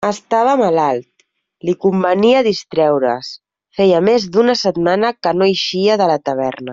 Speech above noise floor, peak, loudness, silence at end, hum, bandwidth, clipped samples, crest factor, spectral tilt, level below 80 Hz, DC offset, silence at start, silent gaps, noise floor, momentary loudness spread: 45 dB; -2 dBFS; -15 LUFS; 0 s; none; 7.8 kHz; under 0.1%; 12 dB; -5.5 dB/octave; -58 dBFS; under 0.1%; 0 s; none; -60 dBFS; 8 LU